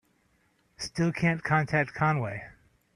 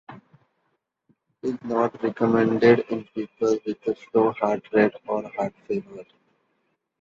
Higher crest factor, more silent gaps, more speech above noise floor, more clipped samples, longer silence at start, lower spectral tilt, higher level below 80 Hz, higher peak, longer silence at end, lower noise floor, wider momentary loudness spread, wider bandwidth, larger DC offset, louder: about the same, 20 dB vs 20 dB; neither; second, 41 dB vs 51 dB; neither; first, 0.8 s vs 0.1 s; second, -6 dB/octave vs -7.5 dB/octave; first, -58 dBFS vs -66 dBFS; second, -10 dBFS vs -4 dBFS; second, 0.45 s vs 1 s; second, -69 dBFS vs -74 dBFS; about the same, 14 LU vs 13 LU; first, 10.5 kHz vs 7.4 kHz; neither; second, -28 LUFS vs -24 LUFS